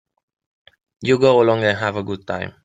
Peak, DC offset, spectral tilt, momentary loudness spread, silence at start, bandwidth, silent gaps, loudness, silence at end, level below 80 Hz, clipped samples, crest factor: -2 dBFS; under 0.1%; -6 dB/octave; 13 LU; 1 s; 9.2 kHz; none; -18 LUFS; 0.15 s; -58 dBFS; under 0.1%; 18 dB